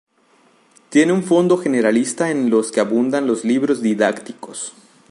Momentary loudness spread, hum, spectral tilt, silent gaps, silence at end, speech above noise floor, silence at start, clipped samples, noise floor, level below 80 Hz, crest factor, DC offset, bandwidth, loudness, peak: 14 LU; none; -5 dB/octave; none; 0.4 s; 39 dB; 0.9 s; under 0.1%; -56 dBFS; -68 dBFS; 16 dB; under 0.1%; 11.5 kHz; -17 LUFS; -2 dBFS